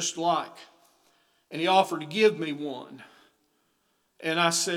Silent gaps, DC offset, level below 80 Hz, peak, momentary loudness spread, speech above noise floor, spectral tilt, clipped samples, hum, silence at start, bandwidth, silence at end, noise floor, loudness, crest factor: none; under 0.1%; -90 dBFS; -8 dBFS; 17 LU; 46 dB; -3 dB/octave; under 0.1%; none; 0 s; 17 kHz; 0 s; -72 dBFS; -26 LUFS; 20 dB